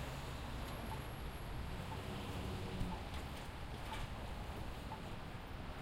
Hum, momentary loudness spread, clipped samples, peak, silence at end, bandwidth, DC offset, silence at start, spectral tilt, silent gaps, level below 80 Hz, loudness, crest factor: none; 4 LU; under 0.1%; -28 dBFS; 0 s; 16 kHz; under 0.1%; 0 s; -5.5 dB/octave; none; -50 dBFS; -47 LUFS; 18 dB